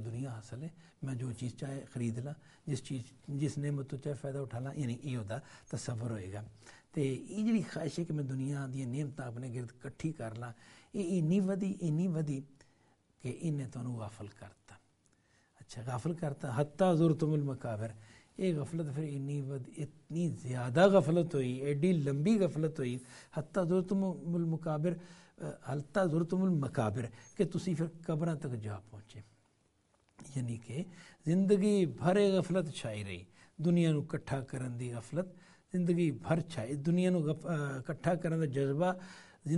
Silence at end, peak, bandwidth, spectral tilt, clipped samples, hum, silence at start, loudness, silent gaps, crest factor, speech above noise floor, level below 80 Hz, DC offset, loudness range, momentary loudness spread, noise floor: 0 s; -12 dBFS; 11.5 kHz; -7.5 dB/octave; under 0.1%; none; 0 s; -35 LUFS; none; 22 dB; 39 dB; -68 dBFS; under 0.1%; 9 LU; 15 LU; -73 dBFS